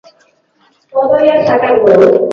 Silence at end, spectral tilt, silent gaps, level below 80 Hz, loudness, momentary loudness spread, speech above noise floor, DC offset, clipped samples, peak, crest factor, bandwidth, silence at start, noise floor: 0 s; -7.5 dB/octave; none; -50 dBFS; -9 LUFS; 8 LU; 46 dB; under 0.1%; 0.1%; 0 dBFS; 10 dB; 6.8 kHz; 0.95 s; -54 dBFS